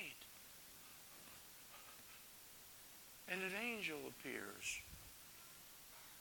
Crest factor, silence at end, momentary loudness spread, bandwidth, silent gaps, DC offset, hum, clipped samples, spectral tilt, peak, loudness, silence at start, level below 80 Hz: 26 dB; 0 s; 14 LU; 19 kHz; none; under 0.1%; none; under 0.1%; -2 dB/octave; -26 dBFS; -50 LUFS; 0 s; -76 dBFS